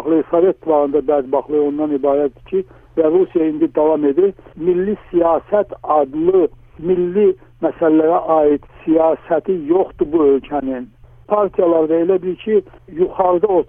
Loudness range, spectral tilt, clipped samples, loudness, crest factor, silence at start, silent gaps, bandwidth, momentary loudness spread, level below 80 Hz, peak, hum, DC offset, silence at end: 1 LU; -11 dB/octave; under 0.1%; -16 LUFS; 14 dB; 0 s; none; 3.6 kHz; 7 LU; -48 dBFS; -2 dBFS; none; under 0.1%; 0.05 s